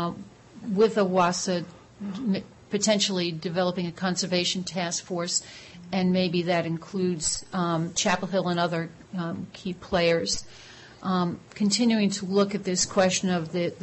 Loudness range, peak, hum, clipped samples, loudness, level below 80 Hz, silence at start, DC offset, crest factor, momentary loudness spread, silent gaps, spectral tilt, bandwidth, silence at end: 2 LU; -10 dBFS; none; under 0.1%; -26 LUFS; -58 dBFS; 0 s; under 0.1%; 16 dB; 13 LU; none; -4 dB/octave; 8.6 kHz; 0 s